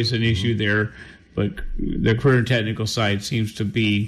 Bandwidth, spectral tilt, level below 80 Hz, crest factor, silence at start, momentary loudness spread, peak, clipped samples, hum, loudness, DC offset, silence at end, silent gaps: 13 kHz; -6 dB/octave; -36 dBFS; 14 dB; 0 s; 10 LU; -8 dBFS; under 0.1%; none; -22 LUFS; under 0.1%; 0 s; none